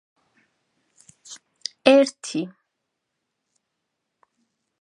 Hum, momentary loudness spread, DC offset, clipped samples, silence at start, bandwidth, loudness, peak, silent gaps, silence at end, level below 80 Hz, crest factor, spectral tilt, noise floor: none; 26 LU; under 0.1%; under 0.1%; 1.3 s; 10.5 kHz; -20 LUFS; 0 dBFS; none; 2.35 s; -76 dBFS; 26 dB; -3.5 dB/octave; -80 dBFS